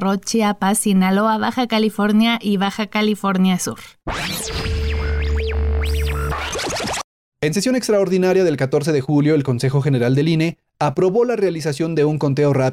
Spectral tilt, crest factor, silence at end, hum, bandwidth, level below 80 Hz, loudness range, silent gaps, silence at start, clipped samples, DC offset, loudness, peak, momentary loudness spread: -5.5 dB/octave; 10 dB; 0 s; none; 16 kHz; -30 dBFS; 5 LU; 7.04-7.32 s; 0 s; under 0.1%; under 0.1%; -18 LUFS; -8 dBFS; 7 LU